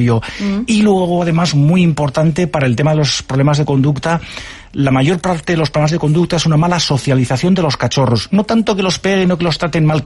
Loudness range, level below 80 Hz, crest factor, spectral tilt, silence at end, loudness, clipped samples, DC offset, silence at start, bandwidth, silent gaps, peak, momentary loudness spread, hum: 2 LU; -40 dBFS; 12 dB; -6 dB/octave; 0 s; -14 LUFS; under 0.1%; under 0.1%; 0 s; 11.5 kHz; none; -2 dBFS; 5 LU; none